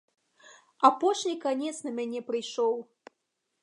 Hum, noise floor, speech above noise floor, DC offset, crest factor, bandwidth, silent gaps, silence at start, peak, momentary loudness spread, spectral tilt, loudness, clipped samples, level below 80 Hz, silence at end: none; -81 dBFS; 53 dB; under 0.1%; 24 dB; 11 kHz; none; 0.45 s; -6 dBFS; 11 LU; -3 dB/octave; -28 LUFS; under 0.1%; -88 dBFS; 0.8 s